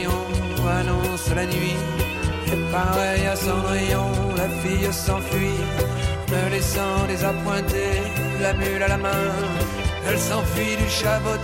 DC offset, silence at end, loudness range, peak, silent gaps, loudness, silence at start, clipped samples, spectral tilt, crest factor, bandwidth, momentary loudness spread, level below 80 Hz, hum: under 0.1%; 0 s; 1 LU; -8 dBFS; none; -23 LUFS; 0 s; under 0.1%; -5 dB/octave; 14 dB; 17 kHz; 3 LU; -32 dBFS; none